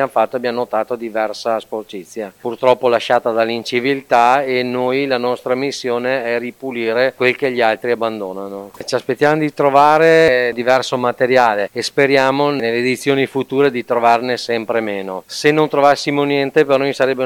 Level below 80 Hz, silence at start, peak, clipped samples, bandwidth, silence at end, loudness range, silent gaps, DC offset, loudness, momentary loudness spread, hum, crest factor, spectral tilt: -60 dBFS; 0 s; 0 dBFS; under 0.1%; 18.5 kHz; 0 s; 5 LU; none; under 0.1%; -16 LUFS; 10 LU; none; 16 dB; -5 dB/octave